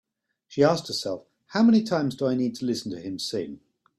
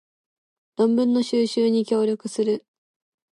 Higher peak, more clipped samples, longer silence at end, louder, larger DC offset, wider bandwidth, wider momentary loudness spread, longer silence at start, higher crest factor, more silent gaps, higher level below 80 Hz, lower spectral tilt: about the same, -8 dBFS vs -10 dBFS; neither; second, 0.4 s vs 0.75 s; second, -25 LUFS vs -22 LUFS; neither; first, 13 kHz vs 11.5 kHz; first, 14 LU vs 5 LU; second, 0.5 s vs 0.8 s; about the same, 18 dB vs 14 dB; neither; first, -68 dBFS vs -78 dBFS; about the same, -5.5 dB/octave vs -5.5 dB/octave